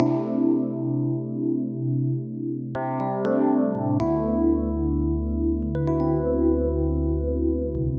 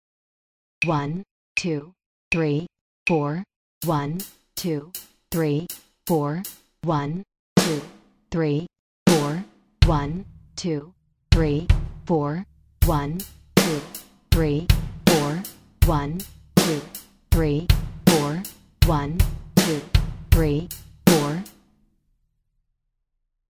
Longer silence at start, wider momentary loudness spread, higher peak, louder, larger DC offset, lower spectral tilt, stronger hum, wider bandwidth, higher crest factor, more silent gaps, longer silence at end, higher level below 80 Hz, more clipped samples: second, 0 s vs 0.8 s; second, 5 LU vs 15 LU; second, -6 dBFS vs 0 dBFS; about the same, -24 LUFS vs -23 LUFS; neither; first, -11.5 dB/octave vs -5.5 dB/octave; neither; second, 5.4 kHz vs 16 kHz; second, 16 dB vs 24 dB; second, none vs 1.31-1.55 s, 2.06-2.31 s, 2.81-3.06 s, 3.56-3.81 s, 7.39-7.56 s, 8.79-9.06 s; second, 0 s vs 2.05 s; about the same, -34 dBFS vs -30 dBFS; neither